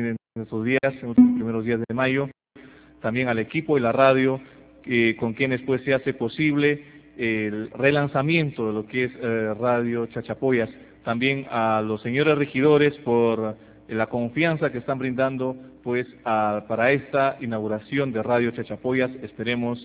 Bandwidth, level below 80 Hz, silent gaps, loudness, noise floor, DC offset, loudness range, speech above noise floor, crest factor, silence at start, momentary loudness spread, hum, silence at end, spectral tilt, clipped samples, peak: 4 kHz; -58 dBFS; none; -23 LUFS; -49 dBFS; under 0.1%; 3 LU; 26 dB; 20 dB; 0 s; 10 LU; none; 0 s; -10.5 dB/octave; under 0.1%; -4 dBFS